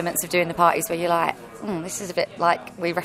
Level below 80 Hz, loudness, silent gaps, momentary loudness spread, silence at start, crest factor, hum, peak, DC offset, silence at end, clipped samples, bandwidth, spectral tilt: -58 dBFS; -23 LUFS; none; 10 LU; 0 s; 20 dB; none; -4 dBFS; under 0.1%; 0 s; under 0.1%; 16 kHz; -3.5 dB/octave